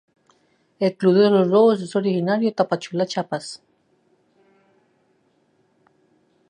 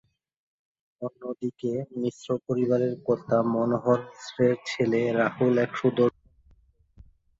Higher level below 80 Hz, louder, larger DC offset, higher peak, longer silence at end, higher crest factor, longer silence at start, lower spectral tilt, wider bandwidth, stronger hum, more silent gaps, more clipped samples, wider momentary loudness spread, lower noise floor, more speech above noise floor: second, -74 dBFS vs -64 dBFS; first, -20 LUFS vs -26 LUFS; neither; first, -4 dBFS vs -8 dBFS; first, 2.95 s vs 1.3 s; about the same, 18 dB vs 20 dB; second, 0.8 s vs 1 s; about the same, -6.5 dB/octave vs -7 dB/octave; first, 10 kHz vs 7.8 kHz; neither; neither; neither; first, 14 LU vs 10 LU; about the same, -64 dBFS vs -61 dBFS; first, 45 dB vs 35 dB